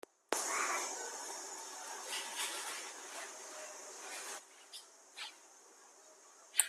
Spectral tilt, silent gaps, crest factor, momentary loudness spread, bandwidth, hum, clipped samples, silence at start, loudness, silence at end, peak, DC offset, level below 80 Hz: 2.5 dB/octave; none; 32 dB; 23 LU; 15.5 kHz; none; under 0.1%; 0.3 s; -41 LUFS; 0 s; -12 dBFS; under 0.1%; under -90 dBFS